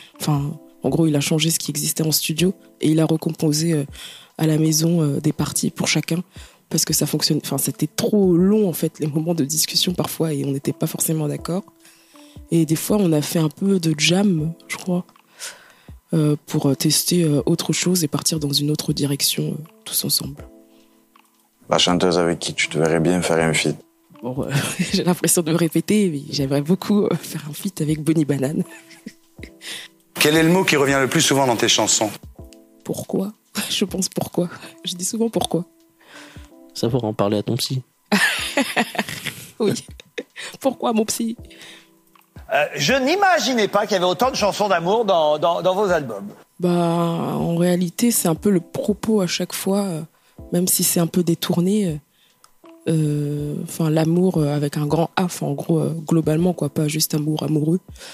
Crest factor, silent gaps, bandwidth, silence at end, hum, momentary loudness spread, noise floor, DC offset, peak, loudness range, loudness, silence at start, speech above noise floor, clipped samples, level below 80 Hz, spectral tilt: 20 dB; none; 15.5 kHz; 0 s; none; 12 LU; -56 dBFS; under 0.1%; -2 dBFS; 5 LU; -20 LUFS; 0 s; 37 dB; under 0.1%; -52 dBFS; -4.5 dB/octave